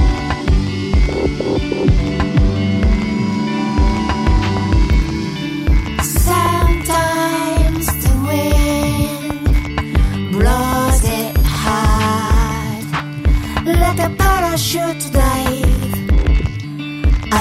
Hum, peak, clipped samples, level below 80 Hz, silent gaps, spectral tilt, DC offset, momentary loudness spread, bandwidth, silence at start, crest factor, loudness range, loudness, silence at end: none; -2 dBFS; under 0.1%; -18 dBFS; none; -5.5 dB/octave; under 0.1%; 4 LU; 16 kHz; 0 s; 12 dB; 1 LU; -16 LUFS; 0 s